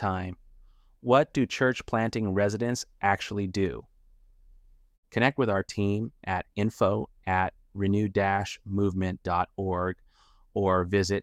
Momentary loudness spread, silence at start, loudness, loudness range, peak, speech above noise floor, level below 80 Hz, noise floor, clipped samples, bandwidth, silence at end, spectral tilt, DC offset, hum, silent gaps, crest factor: 8 LU; 0 s; -28 LUFS; 3 LU; -8 dBFS; 33 dB; -54 dBFS; -60 dBFS; under 0.1%; 13 kHz; 0 s; -6 dB/octave; under 0.1%; none; 4.98-5.03 s; 20 dB